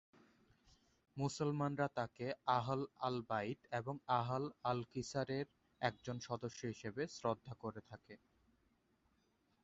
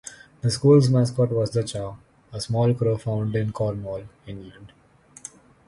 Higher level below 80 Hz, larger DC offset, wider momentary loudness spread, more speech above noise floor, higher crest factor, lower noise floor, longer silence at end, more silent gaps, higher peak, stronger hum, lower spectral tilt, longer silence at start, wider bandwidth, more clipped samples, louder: second, -74 dBFS vs -52 dBFS; neither; second, 11 LU vs 23 LU; first, 37 dB vs 23 dB; about the same, 22 dB vs 18 dB; first, -79 dBFS vs -45 dBFS; first, 1.5 s vs 1 s; neither; second, -20 dBFS vs -4 dBFS; neither; second, -5 dB/octave vs -7 dB/octave; first, 1.15 s vs 0.05 s; second, 7.6 kHz vs 11.5 kHz; neither; second, -42 LUFS vs -23 LUFS